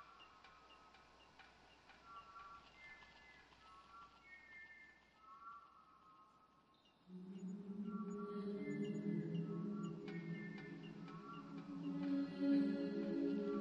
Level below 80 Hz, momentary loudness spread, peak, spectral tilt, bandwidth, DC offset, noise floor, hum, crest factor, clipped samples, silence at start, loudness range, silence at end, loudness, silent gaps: -80 dBFS; 23 LU; -28 dBFS; -8 dB/octave; 7.4 kHz; under 0.1%; -73 dBFS; none; 20 dB; under 0.1%; 0 s; 17 LU; 0 s; -45 LUFS; none